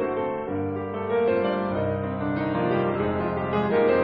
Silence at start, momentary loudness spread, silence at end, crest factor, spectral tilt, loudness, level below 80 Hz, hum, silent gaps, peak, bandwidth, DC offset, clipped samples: 0 s; 6 LU; 0 s; 14 dB; -10.5 dB/octave; -25 LUFS; -52 dBFS; none; none; -10 dBFS; 5.2 kHz; under 0.1%; under 0.1%